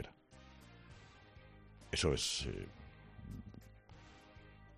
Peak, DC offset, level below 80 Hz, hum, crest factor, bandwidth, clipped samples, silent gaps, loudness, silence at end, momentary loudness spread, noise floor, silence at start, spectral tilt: -22 dBFS; under 0.1%; -56 dBFS; none; 22 dB; 13 kHz; under 0.1%; none; -40 LUFS; 0 s; 25 LU; -61 dBFS; 0 s; -3.5 dB/octave